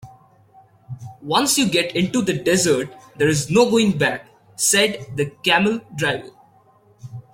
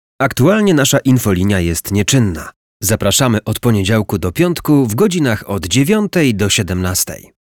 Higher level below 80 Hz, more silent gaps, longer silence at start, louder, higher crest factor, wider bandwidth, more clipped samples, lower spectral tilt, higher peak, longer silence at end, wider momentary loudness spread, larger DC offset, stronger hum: second, -56 dBFS vs -38 dBFS; second, none vs 2.56-2.80 s; second, 0.05 s vs 0.2 s; second, -19 LUFS vs -14 LUFS; first, 18 dB vs 12 dB; second, 16.5 kHz vs 19.5 kHz; neither; about the same, -3.5 dB/octave vs -4.5 dB/octave; about the same, -2 dBFS vs -2 dBFS; second, 0.1 s vs 0.3 s; first, 18 LU vs 6 LU; neither; neither